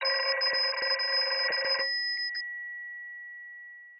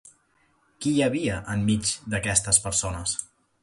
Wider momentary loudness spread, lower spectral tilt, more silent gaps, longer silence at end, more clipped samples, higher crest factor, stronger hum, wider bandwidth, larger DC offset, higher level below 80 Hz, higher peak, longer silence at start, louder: first, 16 LU vs 9 LU; second, -2 dB/octave vs -3.5 dB/octave; neither; second, 0 s vs 0.35 s; neither; second, 16 dB vs 22 dB; neither; second, 5.8 kHz vs 12 kHz; neither; second, -84 dBFS vs -46 dBFS; second, -16 dBFS vs -4 dBFS; second, 0 s vs 0.8 s; second, -27 LUFS vs -24 LUFS